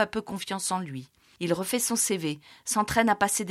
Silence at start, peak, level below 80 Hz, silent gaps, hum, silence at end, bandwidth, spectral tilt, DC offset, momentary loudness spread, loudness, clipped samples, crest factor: 0 s; -10 dBFS; -58 dBFS; none; none; 0 s; 16.5 kHz; -3 dB/octave; under 0.1%; 11 LU; -27 LUFS; under 0.1%; 18 dB